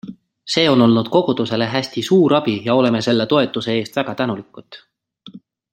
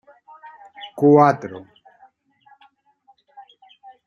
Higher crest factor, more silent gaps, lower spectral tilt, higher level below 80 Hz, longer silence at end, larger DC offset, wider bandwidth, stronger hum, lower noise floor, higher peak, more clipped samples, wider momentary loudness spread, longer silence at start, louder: second, 16 dB vs 22 dB; neither; second, -6 dB/octave vs -8.5 dB/octave; first, -60 dBFS vs -68 dBFS; second, 0.35 s vs 2.5 s; neither; first, 13 kHz vs 6.6 kHz; neither; second, -42 dBFS vs -59 dBFS; about the same, -2 dBFS vs -2 dBFS; neither; second, 9 LU vs 27 LU; second, 0.05 s vs 0.8 s; about the same, -17 LUFS vs -16 LUFS